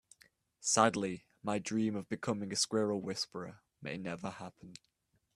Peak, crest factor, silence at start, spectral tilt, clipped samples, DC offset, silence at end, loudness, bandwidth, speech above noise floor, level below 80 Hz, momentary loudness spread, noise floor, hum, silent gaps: -12 dBFS; 26 dB; 0.6 s; -3.5 dB/octave; under 0.1%; under 0.1%; 0.6 s; -35 LUFS; 13.5 kHz; 33 dB; -74 dBFS; 19 LU; -68 dBFS; none; none